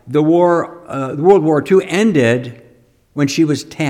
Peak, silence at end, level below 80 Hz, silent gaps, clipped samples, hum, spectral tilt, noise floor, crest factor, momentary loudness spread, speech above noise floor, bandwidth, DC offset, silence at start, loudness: 0 dBFS; 0 s; -56 dBFS; none; under 0.1%; none; -6.5 dB/octave; -50 dBFS; 14 dB; 12 LU; 36 dB; 14 kHz; under 0.1%; 0.05 s; -14 LUFS